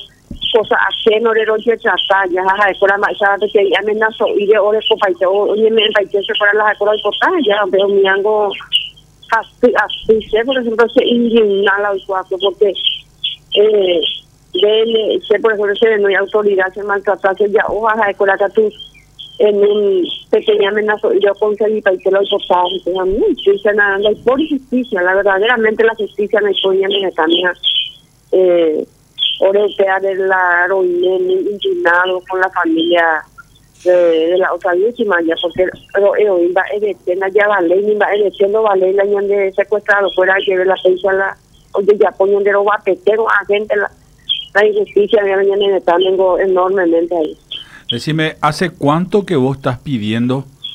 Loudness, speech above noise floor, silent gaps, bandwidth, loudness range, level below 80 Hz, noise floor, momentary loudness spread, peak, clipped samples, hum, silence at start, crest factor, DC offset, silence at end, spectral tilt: -13 LUFS; 24 dB; none; 10 kHz; 2 LU; -48 dBFS; -37 dBFS; 6 LU; 0 dBFS; under 0.1%; none; 0 s; 14 dB; under 0.1%; 0 s; -5.5 dB/octave